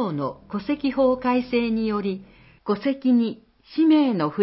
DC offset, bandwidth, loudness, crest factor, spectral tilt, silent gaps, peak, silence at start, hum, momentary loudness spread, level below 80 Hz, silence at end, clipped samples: under 0.1%; 5.8 kHz; -23 LUFS; 14 dB; -11 dB/octave; none; -8 dBFS; 0 s; none; 13 LU; -56 dBFS; 0 s; under 0.1%